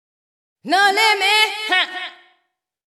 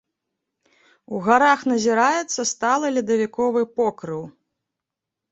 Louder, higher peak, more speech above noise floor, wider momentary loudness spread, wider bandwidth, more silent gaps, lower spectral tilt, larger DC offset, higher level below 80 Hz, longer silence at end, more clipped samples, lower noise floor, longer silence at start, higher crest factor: first, -15 LUFS vs -20 LUFS; about the same, -2 dBFS vs -2 dBFS; second, 55 dB vs 65 dB; second, 12 LU vs 15 LU; first, 17 kHz vs 8.2 kHz; neither; second, 0.5 dB/octave vs -3.5 dB/octave; neither; second, -84 dBFS vs -66 dBFS; second, 0.75 s vs 1 s; neither; second, -72 dBFS vs -85 dBFS; second, 0.65 s vs 1.1 s; about the same, 16 dB vs 20 dB